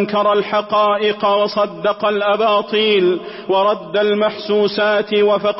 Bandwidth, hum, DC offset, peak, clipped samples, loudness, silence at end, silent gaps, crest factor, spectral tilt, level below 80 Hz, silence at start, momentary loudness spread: 5.8 kHz; none; under 0.1%; -6 dBFS; under 0.1%; -16 LUFS; 0 s; none; 10 dB; -8.5 dB/octave; -60 dBFS; 0 s; 4 LU